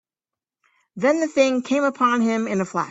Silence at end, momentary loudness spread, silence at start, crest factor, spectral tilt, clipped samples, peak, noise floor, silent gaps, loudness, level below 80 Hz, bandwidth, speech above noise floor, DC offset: 0 s; 5 LU; 0.95 s; 18 dB; -5 dB/octave; under 0.1%; -4 dBFS; -89 dBFS; none; -20 LUFS; -68 dBFS; 8 kHz; 69 dB; under 0.1%